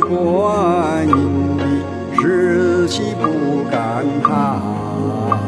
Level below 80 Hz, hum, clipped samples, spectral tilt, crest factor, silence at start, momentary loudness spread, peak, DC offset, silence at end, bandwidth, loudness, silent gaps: -48 dBFS; none; under 0.1%; -7 dB/octave; 16 dB; 0 s; 5 LU; 0 dBFS; under 0.1%; 0 s; 11 kHz; -17 LUFS; none